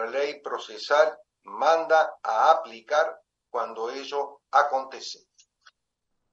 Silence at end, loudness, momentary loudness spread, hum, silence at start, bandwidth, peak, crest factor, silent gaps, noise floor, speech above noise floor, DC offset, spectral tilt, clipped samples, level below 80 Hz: 1.2 s; -25 LUFS; 14 LU; none; 0 s; 7.8 kHz; -6 dBFS; 20 dB; none; -79 dBFS; 54 dB; under 0.1%; -1 dB/octave; under 0.1%; -86 dBFS